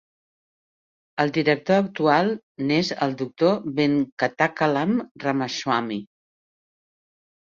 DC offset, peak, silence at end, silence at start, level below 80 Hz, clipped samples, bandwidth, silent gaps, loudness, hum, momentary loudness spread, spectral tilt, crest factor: under 0.1%; -4 dBFS; 1.45 s; 1.15 s; -66 dBFS; under 0.1%; 7.4 kHz; 2.43-2.55 s, 4.12-4.17 s, 5.11-5.15 s; -23 LUFS; none; 6 LU; -6 dB/octave; 20 dB